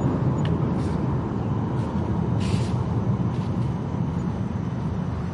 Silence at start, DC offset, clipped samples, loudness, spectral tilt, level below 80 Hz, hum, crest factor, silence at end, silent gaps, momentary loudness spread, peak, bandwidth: 0 s; under 0.1%; under 0.1%; -25 LUFS; -8.5 dB/octave; -40 dBFS; none; 14 dB; 0 s; none; 4 LU; -10 dBFS; 11 kHz